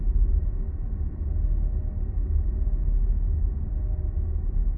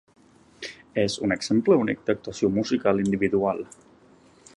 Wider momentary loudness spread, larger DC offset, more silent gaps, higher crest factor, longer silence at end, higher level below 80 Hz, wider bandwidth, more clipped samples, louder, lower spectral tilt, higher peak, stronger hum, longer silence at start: second, 5 LU vs 16 LU; neither; neither; second, 10 dB vs 20 dB; second, 0 s vs 0.9 s; first, -24 dBFS vs -56 dBFS; second, 1.9 kHz vs 11 kHz; neither; second, -29 LUFS vs -24 LUFS; first, -14 dB/octave vs -5.5 dB/octave; second, -12 dBFS vs -6 dBFS; neither; second, 0 s vs 0.6 s